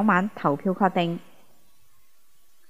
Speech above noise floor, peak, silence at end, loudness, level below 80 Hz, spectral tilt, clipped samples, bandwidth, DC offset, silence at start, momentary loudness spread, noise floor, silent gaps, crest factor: 42 dB; -6 dBFS; 1.5 s; -25 LUFS; -72 dBFS; -7.5 dB/octave; under 0.1%; 15.5 kHz; 0.5%; 0 s; 7 LU; -65 dBFS; none; 22 dB